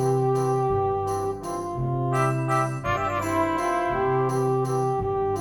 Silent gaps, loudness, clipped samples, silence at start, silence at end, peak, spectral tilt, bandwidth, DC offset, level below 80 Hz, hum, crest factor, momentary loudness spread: none; -25 LUFS; under 0.1%; 0 s; 0 s; -10 dBFS; -7 dB/octave; 17.5 kHz; under 0.1%; -46 dBFS; none; 14 dB; 5 LU